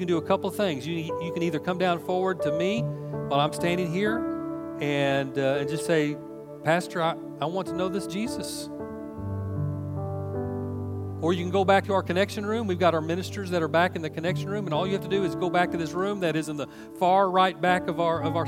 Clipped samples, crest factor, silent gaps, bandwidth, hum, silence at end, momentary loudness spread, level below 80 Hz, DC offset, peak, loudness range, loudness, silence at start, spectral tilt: under 0.1%; 20 dB; none; 16.5 kHz; none; 0 s; 10 LU; -62 dBFS; under 0.1%; -6 dBFS; 6 LU; -27 LUFS; 0 s; -6 dB/octave